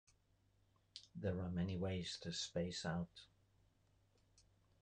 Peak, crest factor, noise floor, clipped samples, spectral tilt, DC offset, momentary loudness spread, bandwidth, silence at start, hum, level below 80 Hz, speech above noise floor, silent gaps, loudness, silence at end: -30 dBFS; 18 dB; -77 dBFS; under 0.1%; -5 dB/octave; under 0.1%; 15 LU; 9.8 kHz; 0.95 s; none; -68 dBFS; 33 dB; none; -44 LUFS; 1.55 s